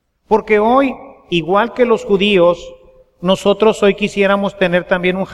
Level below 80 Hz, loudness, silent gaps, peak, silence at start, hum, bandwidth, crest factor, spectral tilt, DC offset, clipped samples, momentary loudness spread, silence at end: -44 dBFS; -14 LUFS; none; 0 dBFS; 0.3 s; none; 12 kHz; 14 dB; -5.5 dB/octave; under 0.1%; under 0.1%; 8 LU; 0 s